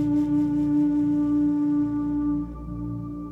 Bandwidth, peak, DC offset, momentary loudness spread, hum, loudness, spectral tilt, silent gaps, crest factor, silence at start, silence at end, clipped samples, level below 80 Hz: 3.1 kHz; -14 dBFS; under 0.1%; 11 LU; none; -24 LUFS; -10 dB/octave; none; 8 dB; 0 s; 0 s; under 0.1%; -44 dBFS